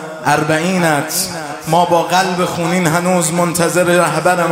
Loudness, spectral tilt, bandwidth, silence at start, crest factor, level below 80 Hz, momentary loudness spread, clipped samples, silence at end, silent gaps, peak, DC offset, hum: -14 LUFS; -4 dB/octave; 16.5 kHz; 0 s; 14 dB; -52 dBFS; 4 LU; under 0.1%; 0 s; none; 0 dBFS; under 0.1%; none